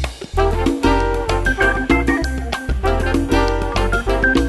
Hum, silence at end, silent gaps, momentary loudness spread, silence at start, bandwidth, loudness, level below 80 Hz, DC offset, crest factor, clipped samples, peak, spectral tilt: none; 0 s; none; 5 LU; 0 s; 12.5 kHz; -18 LUFS; -22 dBFS; under 0.1%; 16 dB; under 0.1%; -2 dBFS; -5.5 dB/octave